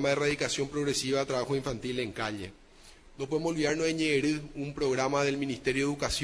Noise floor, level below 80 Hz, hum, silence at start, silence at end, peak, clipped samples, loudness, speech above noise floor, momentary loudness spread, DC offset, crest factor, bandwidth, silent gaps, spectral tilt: -54 dBFS; -52 dBFS; none; 0 s; 0 s; -12 dBFS; under 0.1%; -30 LUFS; 24 dB; 7 LU; under 0.1%; 18 dB; 11 kHz; none; -4 dB/octave